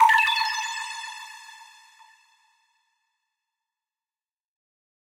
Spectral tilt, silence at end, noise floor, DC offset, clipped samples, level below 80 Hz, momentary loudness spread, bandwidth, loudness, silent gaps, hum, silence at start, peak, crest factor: 5.5 dB/octave; 3.4 s; under -90 dBFS; under 0.1%; under 0.1%; -74 dBFS; 26 LU; 16 kHz; -23 LUFS; none; none; 0 s; -6 dBFS; 22 dB